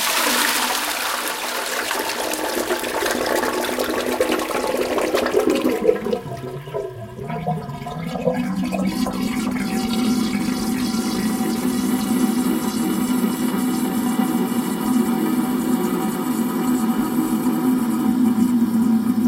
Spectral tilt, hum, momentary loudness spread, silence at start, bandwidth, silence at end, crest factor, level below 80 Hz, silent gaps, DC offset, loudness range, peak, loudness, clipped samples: -4 dB/octave; none; 6 LU; 0 s; 17 kHz; 0 s; 18 dB; -50 dBFS; none; under 0.1%; 3 LU; -2 dBFS; -21 LUFS; under 0.1%